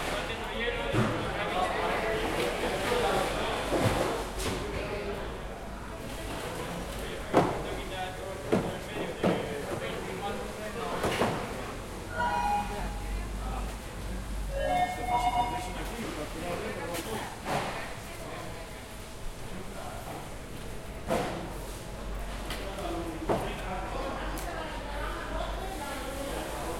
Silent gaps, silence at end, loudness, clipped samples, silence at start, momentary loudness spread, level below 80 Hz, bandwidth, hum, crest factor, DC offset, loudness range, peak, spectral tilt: none; 0 s; -33 LUFS; under 0.1%; 0 s; 12 LU; -42 dBFS; 16.5 kHz; none; 26 dB; under 0.1%; 8 LU; -6 dBFS; -4.5 dB/octave